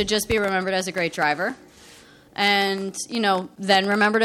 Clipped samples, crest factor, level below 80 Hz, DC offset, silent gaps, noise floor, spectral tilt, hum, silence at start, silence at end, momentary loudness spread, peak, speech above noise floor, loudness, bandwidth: under 0.1%; 18 dB; -50 dBFS; under 0.1%; none; -49 dBFS; -3.5 dB/octave; none; 0 s; 0 s; 9 LU; -4 dBFS; 27 dB; -22 LUFS; 16.5 kHz